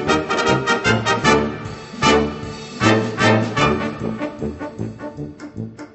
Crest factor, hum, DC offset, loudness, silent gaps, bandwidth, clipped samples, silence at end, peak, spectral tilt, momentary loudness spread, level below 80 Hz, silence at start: 18 dB; none; under 0.1%; -18 LUFS; none; 8.4 kHz; under 0.1%; 0.05 s; -2 dBFS; -5 dB/octave; 16 LU; -40 dBFS; 0 s